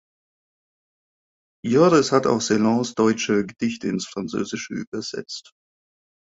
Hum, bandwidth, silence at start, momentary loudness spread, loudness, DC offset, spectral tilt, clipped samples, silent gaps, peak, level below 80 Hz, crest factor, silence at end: none; 8 kHz; 1.65 s; 14 LU; -21 LUFS; under 0.1%; -5 dB/octave; under 0.1%; 4.87-4.92 s; -4 dBFS; -62 dBFS; 20 dB; 0.9 s